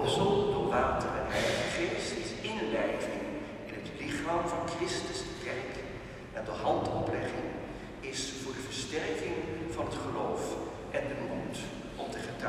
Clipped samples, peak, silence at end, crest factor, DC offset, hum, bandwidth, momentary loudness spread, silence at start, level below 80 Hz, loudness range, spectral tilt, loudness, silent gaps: under 0.1%; -16 dBFS; 0 s; 18 dB; under 0.1%; none; 14 kHz; 11 LU; 0 s; -52 dBFS; 4 LU; -4.5 dB/octave; -34 LUFS; none